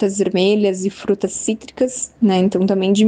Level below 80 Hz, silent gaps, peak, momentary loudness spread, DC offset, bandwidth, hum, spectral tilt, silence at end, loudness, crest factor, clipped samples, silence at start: -56 dBFS; none; -4 dBFS; 7 LU; under 0.1%; 9.8 kHz; none; -5 dB/octave; 0 s; -18 LUFS; 12 dB; under 0.1%; 0 s